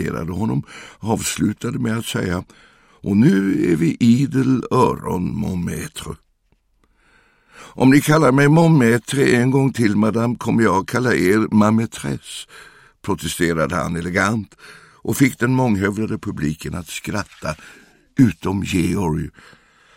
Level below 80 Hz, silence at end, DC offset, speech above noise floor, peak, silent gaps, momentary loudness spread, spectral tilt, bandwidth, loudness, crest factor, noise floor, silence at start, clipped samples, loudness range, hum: -46 dBFS; 0.65 s; under 0.1%; 45 dB; -2 dBFS; none; 15 LU; -6 dB/octave; 16.5 kHz; -18 LUFS; 16 dB; -62 dBFS; 0 s; under 0.1%; 7 LU; none